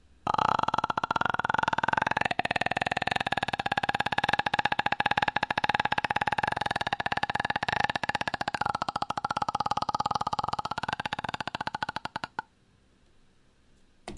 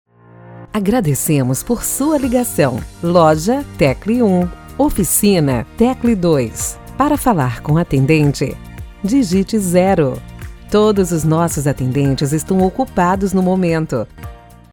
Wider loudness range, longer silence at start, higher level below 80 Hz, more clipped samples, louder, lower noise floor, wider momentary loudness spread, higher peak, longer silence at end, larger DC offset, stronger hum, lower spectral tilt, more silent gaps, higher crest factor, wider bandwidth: first, 6 LU vs 2 LU; second, 0.25 s vs 0.45 s; second, -56 dBFS vs -34 dBFS; neither; second, -29 LUFS vs -15 LUFS; first, -64 dBFS vs -40 dBFS; second, 7 LU vs 10 LU; second, -6 dBFS vs 0 dBFS; second, 0 s vs 0.35 s; neither; neither; second, -4 dB/octave vs -6 dB/octave; neither; first, 24 dB vs 16 dB; second, 11.5 kHz vs over 20 kHz